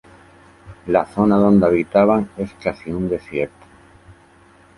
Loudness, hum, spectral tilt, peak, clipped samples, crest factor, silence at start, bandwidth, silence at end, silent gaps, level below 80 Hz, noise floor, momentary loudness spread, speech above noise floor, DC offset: -18 LUFS; none; -9 dB/octave; -2 dBFS; under 0.1%; 18 dB; 0.65 s; 11 kHz; 1.3 s; none; -46 dBFS; -50 dBFS; 13 LU; 33 dB; under 0.1%